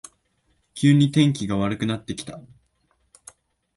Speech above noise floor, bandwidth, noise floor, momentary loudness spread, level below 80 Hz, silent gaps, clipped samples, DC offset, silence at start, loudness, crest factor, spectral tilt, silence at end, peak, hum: 47 dB; 11.5 kHz; -68 dBFS; 22 LU; -54 dBFS; none; under 0.1%; under 0.1%; 0.75 s; -21 LUFS; 18 dB; -6 dB/octave; 1.35 s; -6 dBFS; none